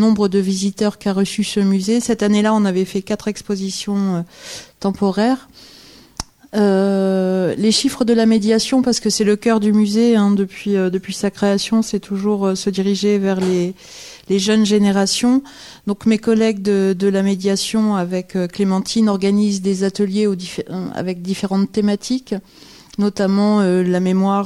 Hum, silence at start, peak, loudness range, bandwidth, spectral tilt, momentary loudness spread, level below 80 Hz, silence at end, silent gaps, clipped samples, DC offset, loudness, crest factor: none; 0 s; -4 dBFS; 5 LU; 13.5 kHz; -5.5 dB/octave; 10 LU; -52 dBFS; 0 s; none; under 0.1%; under 0.1%; -17 LUFS; 12 dB